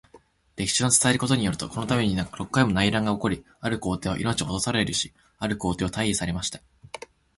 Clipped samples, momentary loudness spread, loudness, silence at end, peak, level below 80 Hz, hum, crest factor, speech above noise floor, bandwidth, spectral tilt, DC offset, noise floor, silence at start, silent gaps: under 0.1%; 13 LU; -25 LUFS; 0.4 s; -6 dBFS; -46 dBFS; none; 20 dB; 31 dB; 11.5 kHz; -4 dB/octave; under 0.1%; -56 dBFS; 0.15 s; none